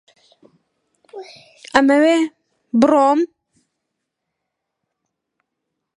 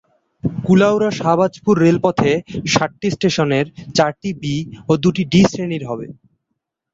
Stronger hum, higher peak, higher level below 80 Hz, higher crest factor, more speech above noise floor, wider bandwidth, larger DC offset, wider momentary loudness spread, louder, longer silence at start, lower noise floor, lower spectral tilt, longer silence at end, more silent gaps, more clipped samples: neither; about the same, 0 dBFS vs -2 dBFS; second, -62 dBFS vs -48 dBFS; about the same, 20 dB vs 16 dB; first, 64 dB vs 60 dB; first, 11 kHz vs 7.8 kHz; neither; first, 24 LU vs 11 LU; about the same, -16 LUFS vs -17 LUFS; first, 1.15 s vs 0.45 s; about the same, -79 dBFS vs -76 dBFS; second, -4.5 dB/octave vs -6 dB/octave; first, 2.7 s vs 0.8 s; neither; neither